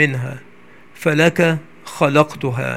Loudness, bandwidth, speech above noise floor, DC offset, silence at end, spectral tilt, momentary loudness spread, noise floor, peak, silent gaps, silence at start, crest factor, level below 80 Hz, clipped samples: -17 LUFS; 16 kHz; 29 dB; 0.6%; 0 s; -6 dB/octave; 15 LU; -46 dBFS; 0 dBFS; none; 0 s; 18 dB; -58 dBFS; under 0.1%